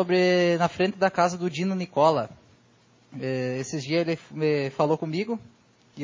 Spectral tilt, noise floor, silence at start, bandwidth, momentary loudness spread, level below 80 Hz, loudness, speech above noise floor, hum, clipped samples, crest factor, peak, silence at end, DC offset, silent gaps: -6 dB/octave; -59 dBFS; 0 s; 7.6 kHz; 10 LU; -66 dBFS; -25 LUFS; 35 dB; none; under 0.1%; 18 dB; -8 dBFS; 0 s; under 0.1%; none